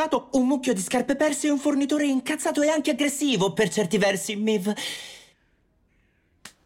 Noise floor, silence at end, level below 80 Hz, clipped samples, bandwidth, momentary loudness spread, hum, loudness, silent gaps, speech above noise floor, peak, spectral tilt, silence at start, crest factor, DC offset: -65 dBFS; 0.15 s; -62 dBFS; under 0.1%; 16.5 kHz; 3 LU; none; -24 LUFS; none; 42 dB; -12 dBFS; -4 dB/octave; 0 s; 12 dB; under 0.1%